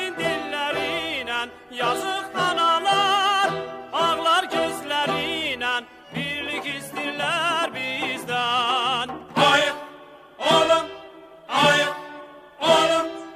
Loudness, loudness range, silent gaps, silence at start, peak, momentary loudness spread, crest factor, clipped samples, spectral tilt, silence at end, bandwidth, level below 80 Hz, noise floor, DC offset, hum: -22 LUFS; 4 LU; none; 0 s; -4 dBFS; 11 LU; 20 dB; under 0.1%; -3 dB/octave; 0 s; 16 kHz; -62 dBFS; -45 dBFS; under 0.1%; none